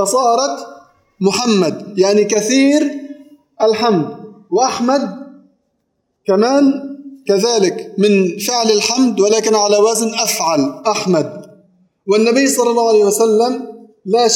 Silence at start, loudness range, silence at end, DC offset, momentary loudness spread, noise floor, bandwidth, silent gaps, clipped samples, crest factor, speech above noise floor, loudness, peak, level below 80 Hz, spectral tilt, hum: 0 s; 4 LU; 0 s; under 0.1%; 14 LU; -68 dBFS; 17.5 kHz; none; under 0.1%; 14 dB; 55 dB; -14 LUFS; 0 dBFS; -66 dBFS; -4 dB/octave; none